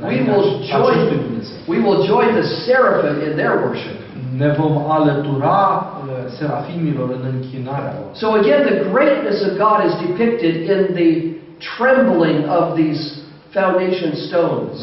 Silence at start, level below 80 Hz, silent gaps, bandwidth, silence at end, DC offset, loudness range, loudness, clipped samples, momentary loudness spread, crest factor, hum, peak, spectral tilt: 0 s; -56 dBFS; none; 6 kHz; 0 s; under 0.1%; 3 LU; -17 LUFS; under 0.1%; 11 LU; 14 dB; none; -2 dBFS; -5.5 dB/octave